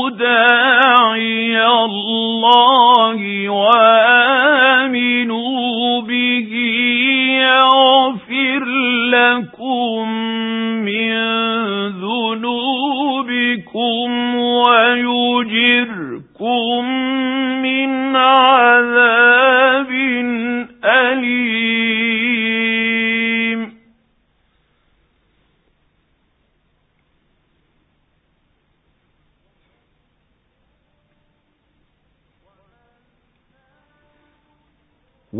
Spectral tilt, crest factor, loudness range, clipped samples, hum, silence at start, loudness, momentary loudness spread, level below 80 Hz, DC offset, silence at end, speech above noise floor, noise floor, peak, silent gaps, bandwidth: -6.5 dB/octave; 16 dB; 7 LU; under 0.1%; none; 0 s; -13 LUFS; 10 LU; -66 dBFS; under 0.1%; 0 s; 49 dB; -63 dBFS; 0 dBFS; none; 4 kHz